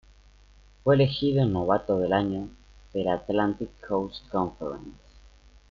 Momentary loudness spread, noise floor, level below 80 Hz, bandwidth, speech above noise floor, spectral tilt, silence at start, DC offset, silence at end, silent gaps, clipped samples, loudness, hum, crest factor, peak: 14 LU; -55 dBFS; -52 dBFS; 7 kHz; 29 dB; -6 dB/octave; 0.85 s; under 0.1%; 0.75 s; none; under 0.1%; -27 LUFS; 50 Hz at -50 dBFS; 20 dB; -8 dBFS